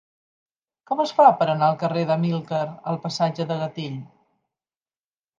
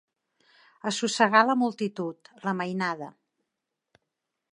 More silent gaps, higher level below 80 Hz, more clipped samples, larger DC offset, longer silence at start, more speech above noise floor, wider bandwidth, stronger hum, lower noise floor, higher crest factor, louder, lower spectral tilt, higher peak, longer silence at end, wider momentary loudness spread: neither; first, -74 dBFS vs -82 dBFS; neither; neither; about the same, 0.9 s vs 0.85 s; first, over 68 dB vs 58 dB; second, 7.6 kHz vs 11 kHz; neither; first, under -90 dBFS vs -84 dBFS; about the same, 22 dB vs 24 dB; first, -22 LUFS vs -26 LUFS; first, -6.5 dB/octave vs -4 dB/octave; about the same, -2 dBFS vs -4 dBFS; about the same, 1.35 s vs 1.4 s; about the same, 13 LU vs 15 LU